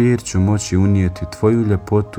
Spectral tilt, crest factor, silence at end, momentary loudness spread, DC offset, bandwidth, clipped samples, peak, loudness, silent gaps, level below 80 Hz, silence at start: -7 dB/octave; 14 dB; 0 s; 3 LU; under 0.1%; 11.5 kHz; under 0.1%; -2 dBFS; -17 LUFS; none; -38 dBFS; 0 s